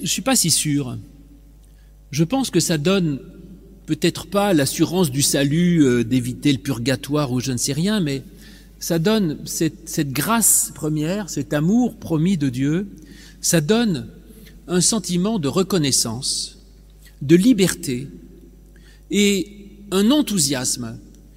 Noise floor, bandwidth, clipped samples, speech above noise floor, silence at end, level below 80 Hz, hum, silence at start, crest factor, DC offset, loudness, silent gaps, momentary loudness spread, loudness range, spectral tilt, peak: -46 dBFS; 16 kHz; under 0.1%; 27 dB; 0.3 s; -46 dBFS; none; 0 s; 20 dB; under 0.1%; -19 LUFS; none; 10 LU; 3 LU; -4 dB/octave; 0 dBFS